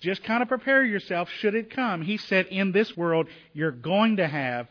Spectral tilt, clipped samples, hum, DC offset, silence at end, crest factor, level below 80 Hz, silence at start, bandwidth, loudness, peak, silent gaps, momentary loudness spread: -7.5 dB/octave; under 0.1%; none; under 0.1%; 0.05 s; 16 dB; -72 dBFS; 0 s; 5.4 kHz; -25 LUFS; -8 dBFS; none; 8 LU